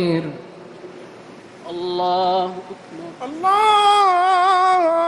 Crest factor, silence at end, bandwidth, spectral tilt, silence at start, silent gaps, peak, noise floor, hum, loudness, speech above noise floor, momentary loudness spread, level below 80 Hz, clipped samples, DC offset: 14 dB; 0 s; 12 kHz; -4.5 dB/octave; 0 s; none; -4 dBFS; -40 dBFS; none; -17 LUFS; 23 dB; 24 LU; -64 dBFS; under 0.1%; under 0.1%